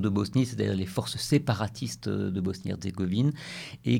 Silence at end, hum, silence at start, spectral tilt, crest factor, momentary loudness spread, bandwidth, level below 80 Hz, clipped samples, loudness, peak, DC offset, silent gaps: 0 s; none; 0 s; -6 dB/octave; 16 dB; 8 LU; 17 kHz; -58 dBFS; under 0.1%; -29 LUFS; -12 dBFS; under 0.1%; none